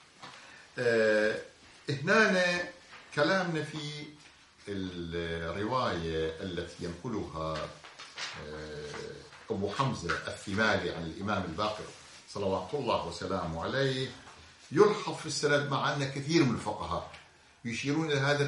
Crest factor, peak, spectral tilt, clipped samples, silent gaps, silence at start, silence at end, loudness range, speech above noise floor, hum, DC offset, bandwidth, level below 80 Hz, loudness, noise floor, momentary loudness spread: 22 dB; -10 dBFS; -5 dB/octave; under 0.1%; none; 0.2 s; 0 s; 7 LU; 26 dB; none; under 0.1%; 11.5 kHz; -62 dBFS; -32 LUFS; -57 dBFS; 19 LU